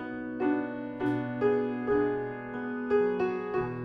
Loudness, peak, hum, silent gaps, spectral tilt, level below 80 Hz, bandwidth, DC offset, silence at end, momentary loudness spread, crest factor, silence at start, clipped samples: -30 LUFS; -16 dBFS; none; none; -9 dB/octave; -60 dBFS; 5.6 kHz; under 0.1%; 0 s; 8 LU; 14 dB; 0 s; under 0.1%